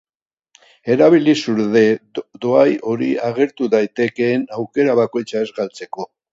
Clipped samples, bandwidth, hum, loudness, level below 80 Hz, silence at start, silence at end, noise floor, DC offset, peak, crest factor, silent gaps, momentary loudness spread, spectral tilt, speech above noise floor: under 0.1%; 7.8 kHz; none; -17 LUFS; -64 dBFS; 0.85 s; 0.3 s; -82 dBFS; under 0.1%; 0 dBFS; 18 dB; none; 12 LU; -6.5 dB/octave; 65 dB